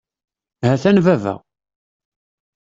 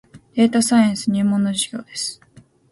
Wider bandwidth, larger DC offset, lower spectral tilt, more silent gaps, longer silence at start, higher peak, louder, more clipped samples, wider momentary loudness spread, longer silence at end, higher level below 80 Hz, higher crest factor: second, 7.8 kHz vs 11.5 kHz; neither; first, -7.5 dB/octave vs -4.5 dB/octave; neither; first, 0.6 s vs 0.15 s; about the same, -2 dBFS vs -4 dBFS; first, -16 LUFS vs -19 LUFS; neither; about the same, 13 LU vs 11 LU; first, 1.3 s vs 0.6 s; first, -54 dBFS vs -60 dBFS; about the same, 18 dB vs 16 dB